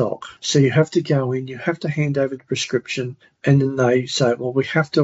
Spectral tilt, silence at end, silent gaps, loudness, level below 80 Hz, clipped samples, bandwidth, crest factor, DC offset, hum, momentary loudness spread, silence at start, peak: -5.5 dB/octave; 0 s; none; -20 LUFS; -62 dBFS; under 0.1%; 8 kHz; 16 dB; under 0.1%; none; 9 LU; 0 s; -2 dBFS